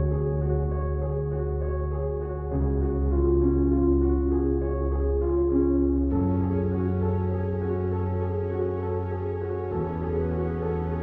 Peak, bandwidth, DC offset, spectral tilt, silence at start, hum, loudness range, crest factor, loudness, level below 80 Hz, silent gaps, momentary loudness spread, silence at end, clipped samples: -12 dBFS; 3.2 kHz; under 0.1%; -13 dB/octave; 0 s; none; 5 LU; 14 dB; -26 LUFS; -30 dBFS; none; 7 LU; 0 s; under 0.1%